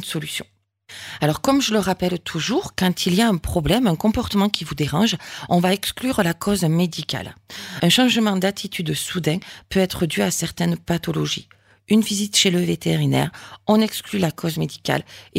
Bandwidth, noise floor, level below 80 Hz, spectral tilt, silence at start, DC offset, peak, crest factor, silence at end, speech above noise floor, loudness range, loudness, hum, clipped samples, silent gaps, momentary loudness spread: 16 kHz; -42 dBFS; -44 dBFS; -4.5 dB/octave; 0 s; under 0.1%; 0 dBFS; 20 dB; 0 s; 21 dB; 2 LU; -21 LUFS; none; under 0.1%; none; 10 LU